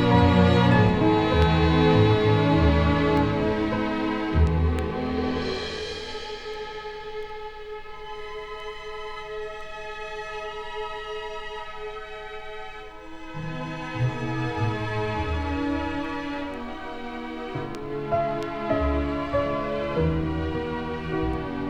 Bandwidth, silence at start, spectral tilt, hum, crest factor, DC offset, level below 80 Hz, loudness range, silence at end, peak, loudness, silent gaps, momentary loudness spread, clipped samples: 9.4 kHz; 0 s; -7.5 dB/octave; none; 18 dB; under 0.1%; -38 dBFS; 15 LU; 0 s; -6 dBFS; -25 LUFS; none; 17 LU; under 0.1%